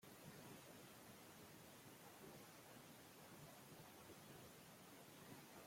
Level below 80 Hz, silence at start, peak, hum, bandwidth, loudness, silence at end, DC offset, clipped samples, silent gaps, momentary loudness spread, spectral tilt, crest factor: -86 dBFS; 0 s; -46 dBFS; none; 16.5 kHz; -61 LUFS; 0 s; under 0.1%; under 0.1%; none; 2 LU; -3.5 dB/octave; 16 dB